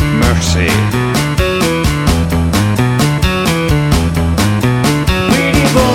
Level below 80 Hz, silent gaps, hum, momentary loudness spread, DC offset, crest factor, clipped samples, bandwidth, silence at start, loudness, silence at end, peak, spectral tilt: -20 dBFS; none; none; 3 LU; under 0.1%; 12 dB; under 0.1%; 17 kHz; 0 s; -12 LUFS; 0 s; 0 dBFS; -5.5 dB/octave